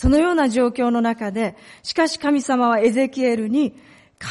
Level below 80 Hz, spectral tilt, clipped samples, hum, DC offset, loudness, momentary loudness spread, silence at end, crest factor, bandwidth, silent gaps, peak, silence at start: -38 dBFS; -5.5 dB/octave; under 0.1%; none; under 0.1%; -20 LUFS; 9 LU; 0 s; 12 dB; 11.5 kHz; none; -6 dBFS; 0 s